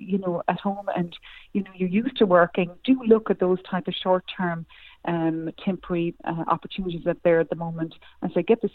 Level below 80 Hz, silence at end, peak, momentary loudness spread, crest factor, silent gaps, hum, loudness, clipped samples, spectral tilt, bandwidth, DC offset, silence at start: -56 dBFS; 0.05 s; -4 dBFS; 12 LU; 20 dB; none; none; -25 LUFS; under 0.1%; -9.5 dB/octave; 4.6 kHz; under 0.1%; 0 s